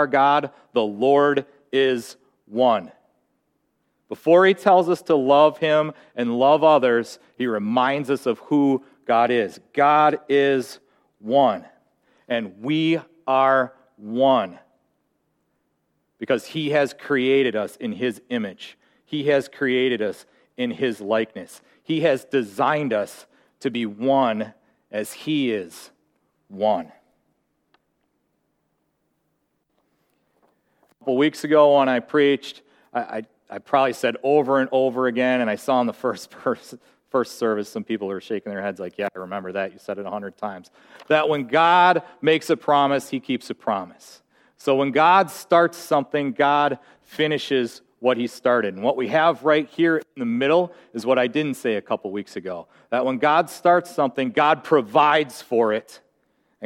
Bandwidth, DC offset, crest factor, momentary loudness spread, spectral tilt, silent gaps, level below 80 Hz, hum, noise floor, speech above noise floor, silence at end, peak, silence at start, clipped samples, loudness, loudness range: 16.5 kHz; under 0.1%; 18 dB; 14 LU; -5.5 dB/octave; none; -74 dBFS; none; -72 dBFS; 51 dB; 0 s; -2 dBFS; 0 s; under 0.1%; -21 LUFS; 8 LU